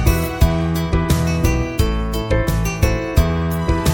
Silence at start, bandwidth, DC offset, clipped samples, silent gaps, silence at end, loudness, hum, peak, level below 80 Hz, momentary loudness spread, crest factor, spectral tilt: 0 s; 17.5 kHz; under 0.1%; under 0.1%; none; 0 s; -19 LUFS; none; -2 dBFS; -22 dBFS; 3 LU; 16 dB; -6 dB/octave